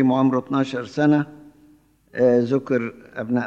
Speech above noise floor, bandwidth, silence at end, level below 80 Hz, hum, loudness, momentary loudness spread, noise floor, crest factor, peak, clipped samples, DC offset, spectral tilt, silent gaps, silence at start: 35 dB; 7.8 kHz; 0 s; -64 dBFS; none; -21 LUFS; 14 LU; -55 dBFS; 16 dB; -6 dBFS; under 0.1%; under 0.1%; -8 dB/octave; none; 0 s